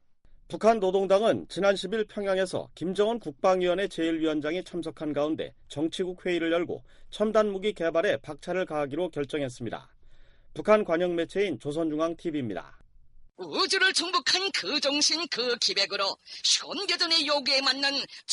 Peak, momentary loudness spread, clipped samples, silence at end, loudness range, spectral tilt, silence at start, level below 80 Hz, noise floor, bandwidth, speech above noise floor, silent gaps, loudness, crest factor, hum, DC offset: -10 dBFS; 11 LU; under 0.1%; 0 s; 5 LU; -3 dB/octave; 0.3 s; -58 dBFS; -54 dBFS; 11.5 kHz; 27 dB; none; -27 LUFS; 18 dB; none; under 0.1%